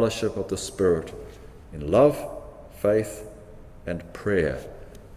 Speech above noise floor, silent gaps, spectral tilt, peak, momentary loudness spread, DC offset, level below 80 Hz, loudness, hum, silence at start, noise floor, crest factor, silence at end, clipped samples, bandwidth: 20 dB; none; -5.5 dB/octave; -6 dBFS; 23 LU; under 0.1%; -44 dBFS; -25 LUFS; none; 0 s; -44 dBFS; 20 dB; 0 s; under 0.1%; 16 kHz